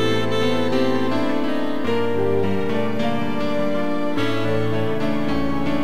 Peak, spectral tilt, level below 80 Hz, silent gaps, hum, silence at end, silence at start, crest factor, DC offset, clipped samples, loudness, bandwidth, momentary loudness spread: -6 dBFS; -6.5 dB/octave; -46 dBFS; none; none; 0 s; 0 s; 14 dB; 8%; under 0.1%; -22 LUFS; 16 kHz; 3 LU